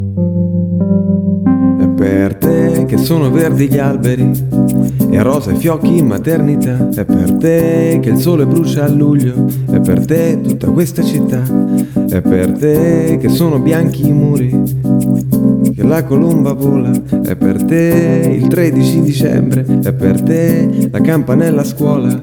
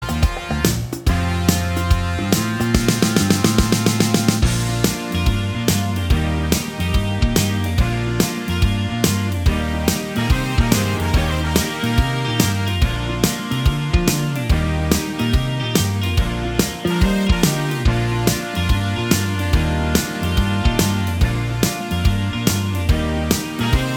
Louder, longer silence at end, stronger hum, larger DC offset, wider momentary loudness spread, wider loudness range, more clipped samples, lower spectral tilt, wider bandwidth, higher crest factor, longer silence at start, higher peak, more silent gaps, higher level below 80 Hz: first, -12 LUFS vs -19 LUFS; about the same, 0 s vs 0 s; neither; neither; about the same, 3 LU vs 4 LU; about the same, 1 LU vs 2 LU; neither; first, -8 dB/octave vs -5 dB/octave; about the same, 19 kHz vs 19 kHz; second, 10 dB vs 18 dB; about the same, 0 s vs 0 s; about the same, 0 dBFS vs 0 dBFS; neither; second, -38 dBFS vs -24 dBFS